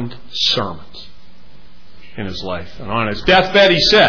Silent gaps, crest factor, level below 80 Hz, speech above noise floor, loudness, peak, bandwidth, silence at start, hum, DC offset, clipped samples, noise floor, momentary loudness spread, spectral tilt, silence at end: none; 16 dB; -38 dBFS; 31 dB; -15 LUFS; -2 dBFS; 5.4 kHz; 0 s; none; 4%; under 0.1%; -46 dBFS; 18 LU; -4 dB/octave; 0 s